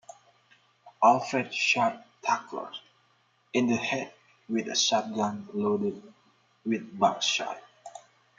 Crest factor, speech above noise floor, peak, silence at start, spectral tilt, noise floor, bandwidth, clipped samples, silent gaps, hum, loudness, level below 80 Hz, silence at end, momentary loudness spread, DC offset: 22 dB; 40 dB; -8 dBFS; 0.85 s; -3 dB/octave; -67 dBFS; 9.2 kHz; under 0.1%; none; none; -28 LUFS; -78 dBFS; 0.4 s; 18 LU; under 0.1%